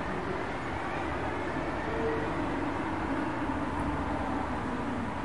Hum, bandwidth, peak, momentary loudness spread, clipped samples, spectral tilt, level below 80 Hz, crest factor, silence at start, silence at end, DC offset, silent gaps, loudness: none; 11.5 kHz; -18 dBFS; 2 LU; under 0.1%; -6.5 dB/octave; -46 dBFS; 14 dB; 0 s; 0 s; 0.6%; none; -33 LUFS